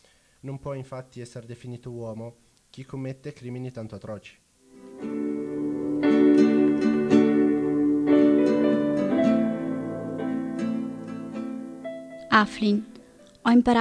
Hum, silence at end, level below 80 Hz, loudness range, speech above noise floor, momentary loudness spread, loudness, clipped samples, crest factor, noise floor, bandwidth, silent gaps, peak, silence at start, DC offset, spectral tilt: none; 0 s; -58 dBFS; 17 LU; 22 dB; 20 LU; -23 LUFS; under 0.1%; 20 dB; -49 dBFS; 10 kHz; none; -4 dBFS; 0.45 s; under 0.1%; -7 dB/octave